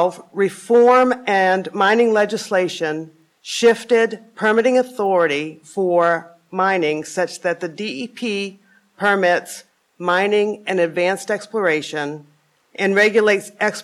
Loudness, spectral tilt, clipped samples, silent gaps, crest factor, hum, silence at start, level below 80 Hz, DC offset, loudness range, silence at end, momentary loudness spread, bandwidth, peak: -18 LUFS; -4 dB/octave; under 0.1%; none; 14 dB; none; 0 s; -72 dBFS; under 0.1%; 4 LU; 0 s; 12 LU; 13 kHz; -4 dBFS